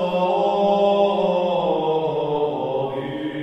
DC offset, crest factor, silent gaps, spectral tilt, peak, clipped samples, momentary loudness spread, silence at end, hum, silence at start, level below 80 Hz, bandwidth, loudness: under 0.1%; 14 dB; none; -7.5 dB/octave; -6 dBFS; under 0.1%; 7 LU; 0 s; none; 0 s; -56 dBFS; 8.2 kHz; -21 LUFS